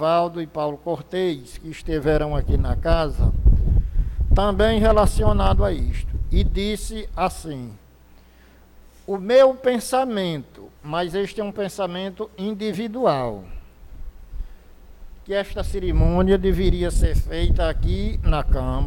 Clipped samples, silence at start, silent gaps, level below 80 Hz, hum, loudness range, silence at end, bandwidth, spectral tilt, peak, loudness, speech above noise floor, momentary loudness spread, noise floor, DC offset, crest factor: under 0.1%; 0 s; none; -24 dBFS; none; 7 LU; 0 s; 16.5 kHz; -6.5 dB/octave; -6 dBFS; -22 LUFS; 30 dB; 15 LU; -50 dBFS; under 0.1%; 14 dB